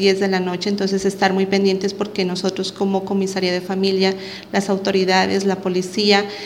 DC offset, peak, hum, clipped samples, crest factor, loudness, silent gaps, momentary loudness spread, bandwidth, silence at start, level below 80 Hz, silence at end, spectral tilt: under 0.1%; -2 dBFS; none; under 0.1%; 16 dB; -19 LUFS; none; 6 LU; 14.5 kHz; 0 s; -60 dBFS; 0 s; -5 dB/octave